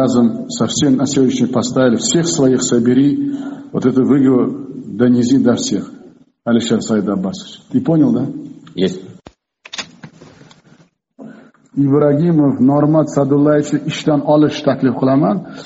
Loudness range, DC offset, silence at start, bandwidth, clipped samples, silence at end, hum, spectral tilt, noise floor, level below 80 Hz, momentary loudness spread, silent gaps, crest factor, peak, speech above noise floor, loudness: 7 LU; under 0.1%; 0 s; 8.2 kHz; under 0.1%; 0 s; none; -6 dB/octave; -50 dBFS; -54 dBFS; 14 LU; none; 14 dB; 0 dBFS; 37 dB; -14 LUFS